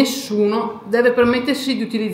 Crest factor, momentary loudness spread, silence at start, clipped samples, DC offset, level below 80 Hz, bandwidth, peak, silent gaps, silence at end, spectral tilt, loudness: 16 dB; 6 LU; 0 s; under 0.1%; under 0.1%; -54 dBFS; 16.5 kHz; 0 dBFS; none; 0 s; -4.5 dB/octave; -18 LUFS